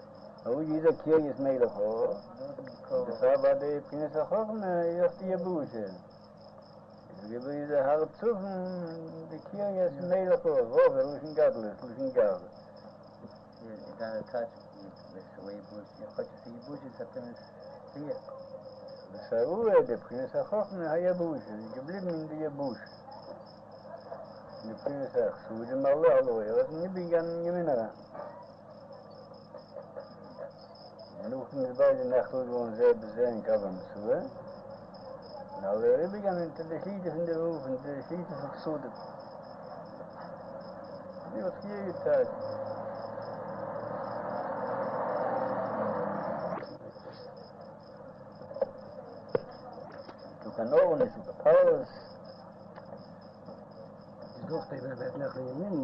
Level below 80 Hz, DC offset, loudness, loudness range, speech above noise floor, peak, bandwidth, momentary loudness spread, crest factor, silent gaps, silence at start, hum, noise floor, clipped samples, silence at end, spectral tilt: -70 dBFS; under 0.1%; -31 LUFS; 13 LU; 22 dB; -12 dBFS; 5.8 kHz; 22 LU; 20 dB; none; 0 s; none; -52 dBFS; under 0.1%; 0 s; -9 dB/octave